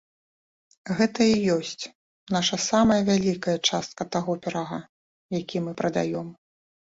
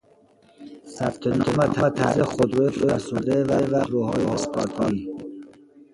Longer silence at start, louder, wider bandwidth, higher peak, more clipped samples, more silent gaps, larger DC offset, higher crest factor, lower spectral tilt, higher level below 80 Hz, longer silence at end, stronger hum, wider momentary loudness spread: first, 0.85 s vs 0.6 s; about the same, -25 LUFS vs -23 LUFS; second, 8 kHz vs 11.5 kHz; about the same, -6 dBFS vs -6 dBFS; neither; first, 1.95-2.27 s, 4.89-5.29 s vs none; neither; about the same, 20 dB vs 18 dB; second, -4.5 dB/octave vs -6.5 dB/octave; second, -56 dBFS vs -50 dBFS; first, 0.6 s vs 0.4 s; neither; about the same, 14 LU vs 14 LU